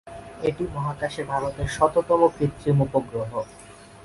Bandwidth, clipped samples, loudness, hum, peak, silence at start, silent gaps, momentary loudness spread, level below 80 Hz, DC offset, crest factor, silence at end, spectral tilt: 11.5 kHz; under 0.1%; -24 LUFS; none; -4 dBFS; 0.05 s; none; 11 LU; -46 dBFS; under 0.1%; 20 dB; 0 s; -7 dB/octave